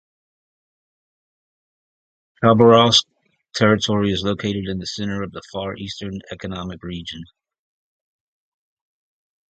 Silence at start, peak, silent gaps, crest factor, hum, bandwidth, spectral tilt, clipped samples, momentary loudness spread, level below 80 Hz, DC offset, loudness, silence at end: 2.4 s; 0 dBFS; none; 22 dB; none; 9 kHz; -5 dB/octave; under 0.1%; 19 LU; -50 dBFS; under 0.1%; -18 LUFS; 2.25 s